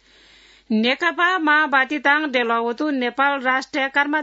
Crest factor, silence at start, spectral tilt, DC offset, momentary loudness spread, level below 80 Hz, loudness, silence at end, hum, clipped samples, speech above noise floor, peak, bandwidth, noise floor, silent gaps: 18 dB; 0.7 s; -4 dB/octave; under 0.1%; 6 LU; -68 dBFS; -19 LUFS; 0 s; none; under 0.1%; 32 dB; -4 dBFS; 8 kHz; -51 dBFS; none